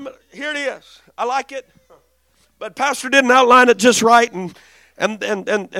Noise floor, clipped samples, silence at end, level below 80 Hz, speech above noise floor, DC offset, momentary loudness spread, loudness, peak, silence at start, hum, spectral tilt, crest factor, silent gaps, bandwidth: -60 dBFS; under 0.1%; 0 s; -62 dBFS; 44 dB; under 0.1%; 22 LU; -15 LUFS; 0 dBFS; 0 s; none; -2.5 dB/octave; 16 dB; none; 16 kHz